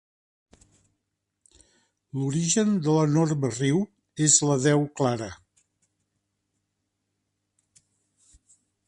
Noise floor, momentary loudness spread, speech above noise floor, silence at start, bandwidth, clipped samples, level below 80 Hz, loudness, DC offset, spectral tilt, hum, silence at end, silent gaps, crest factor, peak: -81 dBFS; 13 LU; 58 dB; 2.15 s; 11 kHz; under 0.1%; -64 dBFS; -23 LUFS; under 0.1%; -4.5 dB/octave; none; 3.55 s; none; 22 dB; -6 dBFS